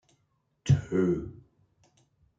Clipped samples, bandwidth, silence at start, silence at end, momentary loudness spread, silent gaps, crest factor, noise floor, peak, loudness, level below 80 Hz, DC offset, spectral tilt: under 0.1%; 7.8 kHz; 0.65 s; 1.05 s; 15 LU; none; 20 dB; -74 dBFS; -12 dBFS; -28 LUFS; -54 dBFS; under 0.1%; -8 dB/octave